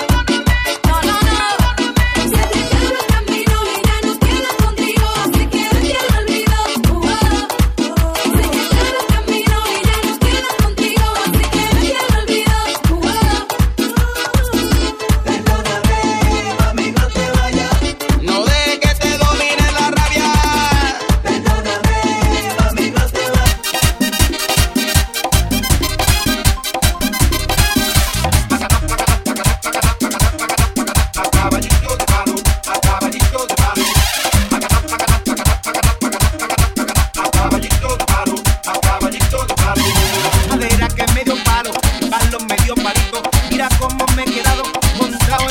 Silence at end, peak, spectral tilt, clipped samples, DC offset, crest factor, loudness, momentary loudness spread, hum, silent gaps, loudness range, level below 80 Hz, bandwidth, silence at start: 0 s; 0 dBFS; -4 dB/octave; under 0.1%; under 0.1%; 14 dB; -15 LUFS; 3 LU; none; none; 1 LU; -18 dBFS; 18 kHz; 0 s